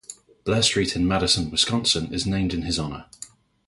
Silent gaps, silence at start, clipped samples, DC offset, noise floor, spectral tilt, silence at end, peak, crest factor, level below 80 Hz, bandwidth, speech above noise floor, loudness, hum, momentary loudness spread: none; 0.1 s; under 0.1%; under 0.1%; -46 dBFS; -3.5 dB/octave; 0.4 s; -4 dBFS; 20 dB; -42 dBFS; 11.5 kHz; 23 dB; -22 LUFS; none; 21 LU